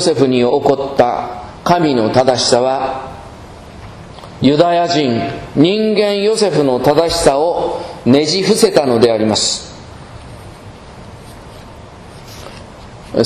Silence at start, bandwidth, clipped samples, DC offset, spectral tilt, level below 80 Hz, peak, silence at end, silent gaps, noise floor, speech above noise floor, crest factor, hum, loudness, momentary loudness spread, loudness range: 0 s; 14 kHz; 0.1%; under 0.1%; -4.5 dB/octave; -42 dBFS; 0 dBFS; 0 s; none; -34 dBFS; 22 dB; 14 dB; none; -13 LUFS; 23 LU; 9 LU